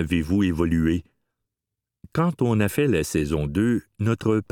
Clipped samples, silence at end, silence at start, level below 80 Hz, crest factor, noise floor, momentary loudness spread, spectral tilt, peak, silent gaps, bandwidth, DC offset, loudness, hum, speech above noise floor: under 0.1%; 0.1 s; 0 s; -40 dBFS; 16 dB; -86 dBFS; 4 LU; -7 dB/octave; -6 dBFS; none; 18 kHz; under 0.1%; -23 LUFS; none; 64 dB